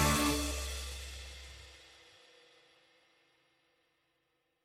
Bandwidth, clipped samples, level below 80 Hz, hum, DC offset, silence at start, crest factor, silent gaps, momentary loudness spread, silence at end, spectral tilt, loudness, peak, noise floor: 16 kHz; under 0.1%; -46 dBFS; none; under 0.1%; 0 s; 24 dB; none; 26 LU; 2.7 s; -3.5 dB/octave; -36 LUFS; -16 dBFS; -80 dBFS